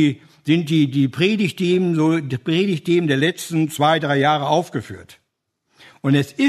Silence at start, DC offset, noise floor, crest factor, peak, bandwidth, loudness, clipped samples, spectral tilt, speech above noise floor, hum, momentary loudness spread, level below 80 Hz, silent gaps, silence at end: 0 s; under 0.1%; -74 dBFS; 18 dB; -2 dBFS; 13.5 kHz; -19 LUFS; under 0.1%; -6 dB/octave; 56 dB; none; 8 LU; -64 dBFS; none; 0 s